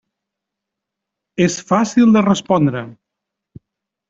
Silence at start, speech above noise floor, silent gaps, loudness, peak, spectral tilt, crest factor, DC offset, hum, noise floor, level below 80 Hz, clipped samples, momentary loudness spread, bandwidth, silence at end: 1.4 s; 67 dB; none; -15 LUFS; -2 dBFS; -6 dB/octave; 16 dB; under 0.1%; none; -82 dBFS; -56 dBFS; under 0.1%; 17 LU; 7.8 kHz; 1.15 s